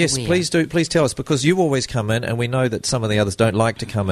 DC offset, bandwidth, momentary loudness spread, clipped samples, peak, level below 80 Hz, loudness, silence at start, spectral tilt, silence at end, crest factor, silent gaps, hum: under 0.1%; 13.5 kHz; 4 LU; under 0.1%; -2 dBFS; -44 dBFS; -19 LUFS; 0 s; -5 dB/octave; 0 s; 16 dB; none; none